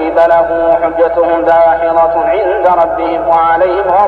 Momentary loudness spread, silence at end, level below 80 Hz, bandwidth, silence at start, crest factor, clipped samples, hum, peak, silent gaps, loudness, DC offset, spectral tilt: 3 LU; 0 s; -38 dBFS; 5 kHz; 0 s; 10 dB; under 0.1%; none; 0 dBFS; none; -10 LUFS; under 0.1%; -7 dB/octave